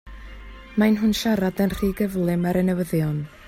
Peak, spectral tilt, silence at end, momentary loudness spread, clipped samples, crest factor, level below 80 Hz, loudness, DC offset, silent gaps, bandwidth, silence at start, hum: -8 dBFS; -6.5 dB/octave; 0 s; 22 LU; under 0.1%; 14 dB; -42 dBFS; -22 LUFS; under 0.1%; none; 16 kHz; 0.05 s; none